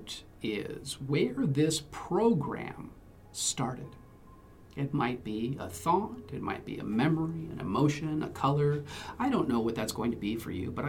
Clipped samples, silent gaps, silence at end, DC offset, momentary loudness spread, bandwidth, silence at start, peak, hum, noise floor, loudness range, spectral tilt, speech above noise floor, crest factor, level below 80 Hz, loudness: under 0.1%; none; 0 s; under 0.1%; 11 LU; 16 kHz; 0 s; -14 dBFS; none; -53 dBFS; 4 LU; -5.5 dB/octave; 22 dB; 18 dB; -56 dBFS; -32 LUFS